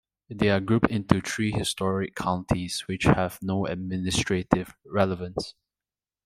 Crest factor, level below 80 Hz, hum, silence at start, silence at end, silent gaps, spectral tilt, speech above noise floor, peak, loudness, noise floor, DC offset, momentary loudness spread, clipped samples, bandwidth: 24 dB; -46 dBFS; none; 0.3 s; 0.75 s; none; -5.5 dB/octave; over 64 dB; -2 dBFS; -26 LUFS; under -90 dBFS; under 0.1%; 8 LU; under 0.1%; 15.5 kHz